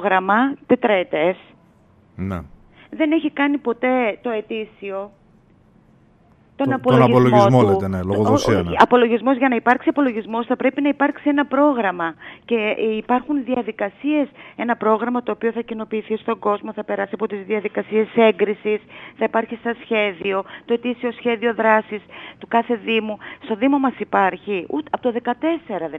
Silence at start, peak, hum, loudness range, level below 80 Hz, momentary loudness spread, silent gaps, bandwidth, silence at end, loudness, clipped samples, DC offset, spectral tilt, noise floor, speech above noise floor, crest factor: 0 s; 0 dBFS; none; 7 LU; -54 dBFS; 12 LU; none; 9.4 kHz; 0 s; -19 LUFS; under 0.1%; under 0.1%; -7 dB/octave; -53 dBFS; 34 dB; 20 dB